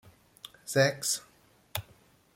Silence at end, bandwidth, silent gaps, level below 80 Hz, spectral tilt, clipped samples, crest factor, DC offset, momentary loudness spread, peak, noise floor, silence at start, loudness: 0.55 s; 16.5 kHz; none; -68 dBFS; -3 dB/octave; under 0.1%; 22 dB; under 0.1%; 21 LU; -12 dBFS; -62 dBFS; 0.65 s; -30 LUFS